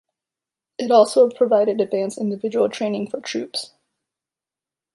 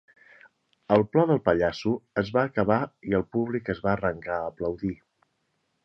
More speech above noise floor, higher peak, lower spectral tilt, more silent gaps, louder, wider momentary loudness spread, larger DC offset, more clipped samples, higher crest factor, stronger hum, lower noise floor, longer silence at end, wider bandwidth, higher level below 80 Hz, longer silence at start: first, 70 dB vs 49 dB; first, -2 dBFS vs -6 dBFS; second, -5 dB/octave vs -8 dB/octave; neither; first, -20 LUFS vs -26 LUFS; first, 14 LU vs 9 LU; neither; neither; about the same, 20 dB vs 22 dB; neither; first, -89 dBFS vs -75 dBFS; first, 1.3 s vs 0.9 s; first, 11.5 kHz vs 7 kHz; second, -74 dBFS vs -52 dBFS; about the same, 0.8 s vs 0.9 s